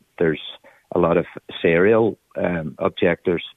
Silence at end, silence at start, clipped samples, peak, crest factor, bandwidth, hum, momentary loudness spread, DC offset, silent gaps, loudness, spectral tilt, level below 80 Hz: 0.05 s; 0.2 s; under 0.1%; -4 dBFS; 16 dB; 4 kHz; none; 10 LU; under 0.1%; none; -20 LUFS; -8.5 dB/octave; -52 dBFS